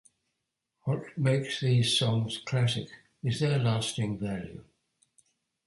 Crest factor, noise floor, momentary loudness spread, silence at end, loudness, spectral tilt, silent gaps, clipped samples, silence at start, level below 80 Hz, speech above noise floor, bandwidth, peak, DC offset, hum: 16 dB; -84 dBFS; 13 LU; 1.05 s; -29 LUFS; -5.5 dB/octave; none; under 0.1%; 0.85 s; -60 dBFS; 55 dB; 11.5 kHz; -14 dBFS; under 0.1%; none